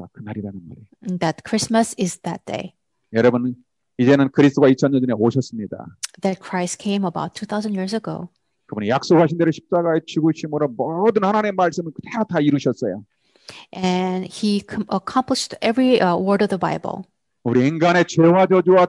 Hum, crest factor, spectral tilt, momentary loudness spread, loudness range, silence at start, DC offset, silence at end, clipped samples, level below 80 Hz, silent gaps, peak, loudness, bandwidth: none; 18 dB; -6 dB/octave; 16 LU; 5 LU; 0 s; under 0.1%; 0 s; under 0.1%; -64 dBFS; none; -2 dBFS; -19 LUFS; 11.5 kHz